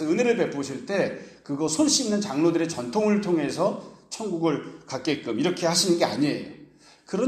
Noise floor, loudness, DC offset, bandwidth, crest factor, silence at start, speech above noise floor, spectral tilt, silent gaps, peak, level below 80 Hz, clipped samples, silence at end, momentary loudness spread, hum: -51 dBFS; -25 LUFS; under 0.1%; 15 kHz; 16 dB; 0 s; 27 dB; -4 dB/octave; none; -8 dBFS; -66 dBFS; under 0.1%; 0 s; 13 LU; none